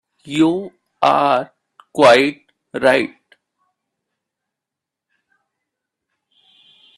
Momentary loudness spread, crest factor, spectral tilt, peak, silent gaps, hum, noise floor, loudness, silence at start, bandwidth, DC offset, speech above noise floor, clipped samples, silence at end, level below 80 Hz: 18 LU; 20 dB; -5 dB/octave; 0 dBFS; none; none; -84 dBFS; -16 LUFS; 0.25 s; 13 kHz; under 0.1%; 70 dB; under 0.1%; 3.9 s; -62 dBFS